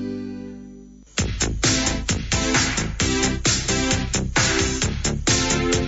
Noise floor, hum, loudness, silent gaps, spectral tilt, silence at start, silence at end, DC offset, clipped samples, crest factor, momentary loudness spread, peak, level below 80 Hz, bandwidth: -43 dBFS; 50 Hz at -40 dBFS; -21 LUFS; none; -3 dB/octave; 0 s; 0 s; under 0.1%; under 0.1%; 14 dB; 11 LU; -8 dBFS; -32 dBFS; 8.2 kHz